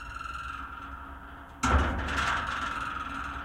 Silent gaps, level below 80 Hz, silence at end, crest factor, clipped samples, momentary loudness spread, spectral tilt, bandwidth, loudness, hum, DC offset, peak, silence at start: none; -38 dBFS; 0 s; 20 dB; under 0.1%; 16 LU; -4.5 dB/octave; 13.5 kHz; -31 LUFS; none; under 0.1%; -12 dBFS; 0 s